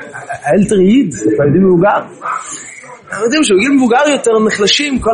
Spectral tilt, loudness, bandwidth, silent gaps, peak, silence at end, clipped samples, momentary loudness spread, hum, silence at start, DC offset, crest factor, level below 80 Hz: -4.5 dB/octave; -11 LUFS; 11 kHz; none; 0 dBFS; 0 s; under 0.1%; 13 LU; none; 0 s; under 0.1%; 12 dB; -42 dBFS